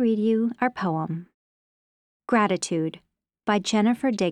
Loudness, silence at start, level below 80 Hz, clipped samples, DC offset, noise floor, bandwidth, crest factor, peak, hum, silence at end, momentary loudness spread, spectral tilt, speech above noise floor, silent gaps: -24 LUFS; 0 s; -70 dBFS; under 0.1%; under 0.1%; under -90 dBFS; 11 kHz; 18 dB; -8 dBFS; none; 0 s; 11 LU; -5.5 dB/octave; over 67 dB; 1.34-2.20 s